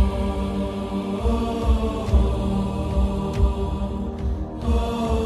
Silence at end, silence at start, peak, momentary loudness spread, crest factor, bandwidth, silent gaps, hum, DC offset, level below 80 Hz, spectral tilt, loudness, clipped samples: 0 s; 0 s; -6 dBFS; 6 LU; 16 dB; 12 kHz; none; none; under 0.1%; -24 dBFS; -8 dB/octave; -24 LUFS; under 0.1%